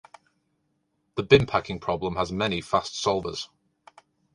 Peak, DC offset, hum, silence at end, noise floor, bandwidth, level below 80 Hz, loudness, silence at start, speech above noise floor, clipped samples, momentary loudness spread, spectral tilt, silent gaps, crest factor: -2 dBFS; under 0.1%; none; 0.9 s; -74 dBFS; 11 kHz; -50 dBFS; -25 LUFS; 1.15 s; 49 dB; under 0.1%; 15 LU; -5 dB/octave; none; 24 dB